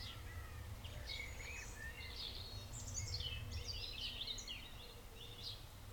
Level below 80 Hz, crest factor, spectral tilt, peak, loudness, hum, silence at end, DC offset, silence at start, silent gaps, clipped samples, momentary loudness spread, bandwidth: -54 dBFS; 16 dB; -2.5 dB/octave; -32 dBFS; -47 LUFS; none; 0 s; under 0.1%; 0 s; none; under 0.1%; 9 LU; 19.5 kHz